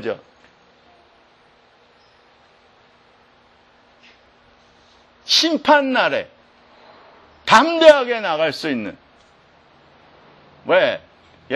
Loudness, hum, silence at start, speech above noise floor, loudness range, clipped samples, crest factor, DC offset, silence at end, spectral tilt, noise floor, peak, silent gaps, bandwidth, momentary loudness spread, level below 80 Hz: -16 LUFS; none; 0 s; 38 dB; 8 LU; under 0.1%; 22 dB; under 0.1%; 0 s; -3 dB/octave; -54 dBFS; 0 dBFS; none; 12 kHz; 22 LU; -62 dBFS